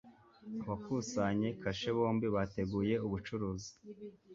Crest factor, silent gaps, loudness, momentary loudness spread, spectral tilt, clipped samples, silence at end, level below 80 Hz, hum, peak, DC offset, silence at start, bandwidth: 18 dB; none; -37 LUFS; 17 LU; -6 dB/octave; under 0.1%; 0 s; -60 dBFS; none; -20 dBFS; under 0.1%; 0.05 s; 7.6 kHz